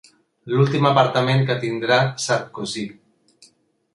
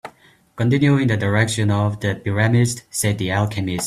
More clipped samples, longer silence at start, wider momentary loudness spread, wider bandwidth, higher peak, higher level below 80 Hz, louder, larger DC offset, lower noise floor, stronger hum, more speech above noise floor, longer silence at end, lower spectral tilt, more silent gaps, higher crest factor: neither; first, 0.45 s vs 0.05 s; first, 12 LU vs 6 LU; second, 11.5 kHz vs 13.5 kHz; about the same, -2 dBFS vs -2 dBFS; second, -62 dBFS vs -50 dBFS; about the same, -20 LUFS vs -19 LUFS; neither; first, -58 dBFS vs -51 dBFS; neither; first, 39 dB vs 32 dB; first, 1 s vs 0 s; about the same, -5.5 dB/octave vs -5.5 dB/octave; neither; about the same, 18 dB vs 16 dB